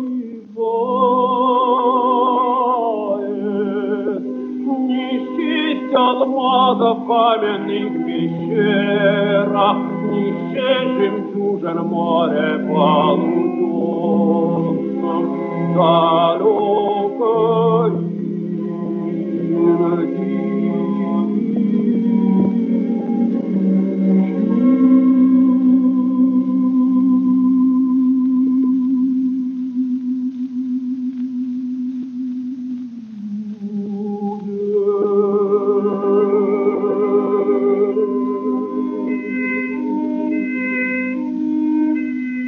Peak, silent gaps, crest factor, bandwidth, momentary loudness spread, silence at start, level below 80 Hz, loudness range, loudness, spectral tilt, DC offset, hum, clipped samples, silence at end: -2 dBFS; none; 14 dB; 4 kHz; 9 LU; 0 s; -72 dBFS; 6 LU; -17 LUFS; -9.5 dB/octave; under 0.1%; none; under 0.1%; 0 s